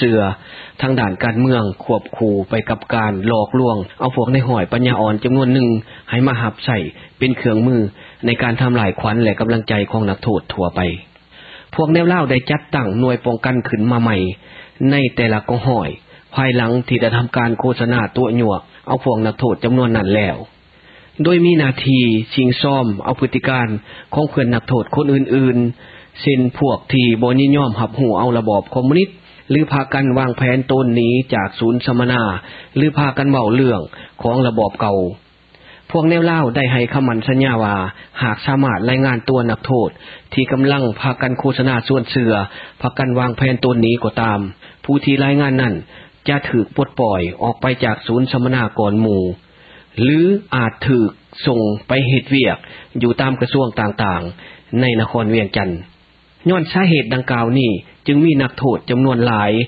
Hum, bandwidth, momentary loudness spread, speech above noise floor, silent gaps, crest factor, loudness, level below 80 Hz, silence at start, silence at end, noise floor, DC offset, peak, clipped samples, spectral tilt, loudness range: none; 5 kHz; 8 LU; 35 dB; none; 16 dB; -16 LUFS; -42 dBFS; 0 s; 0 s; -50 dBFS; under 0.1%; 0 dBFS; under 0.1%; -11 dB/octave; 2 LU